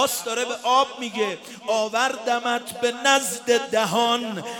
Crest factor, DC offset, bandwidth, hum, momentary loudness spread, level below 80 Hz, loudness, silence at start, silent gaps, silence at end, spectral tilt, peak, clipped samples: 18 dB; under 0.1%; 18 kHz; none; 7 LU; -72 dBFS; -22 LUFS; 0 s; none; 0 s; -2 dB/octave; -4 dBFS; under 0.1%